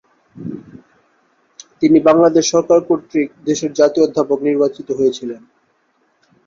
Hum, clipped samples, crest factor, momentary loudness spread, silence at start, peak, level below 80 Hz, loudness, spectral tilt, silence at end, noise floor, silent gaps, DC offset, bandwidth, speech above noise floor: none; under 0.1%; 16 dB; 19 LU; 0.4 s; 0 dBFS; -58 dBFS; -15 LUFS; -5 dB/octave; 1.1 s; -61 dBFS; none; under 0.1%; 7.6 kHz; 47 dB